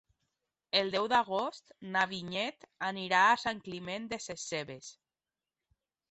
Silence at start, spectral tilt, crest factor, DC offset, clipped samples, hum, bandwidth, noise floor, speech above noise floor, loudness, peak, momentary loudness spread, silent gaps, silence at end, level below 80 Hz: 0.75 s; -3 dB/octave; 22 dB; under 0.1%; under 0.1%; none; 8.2 kHz; under -90 dBFS; over 57 dB; -32 LUFS; -12 dBFS; 14 LU; none; 1.2 s; -72 dBFS